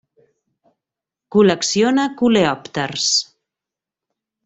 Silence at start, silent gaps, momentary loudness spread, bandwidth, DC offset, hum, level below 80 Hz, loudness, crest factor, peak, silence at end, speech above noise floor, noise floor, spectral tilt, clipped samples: 1.35 s; none; 8 LU; 8.4 kHz; under 0.1%; none; -58 dBFS; -17 LUFS; 18 dB; -2 dBFS; 1.2 s; 71 dB; -87 dBFS; -3.5 dB/octave; under 0.1%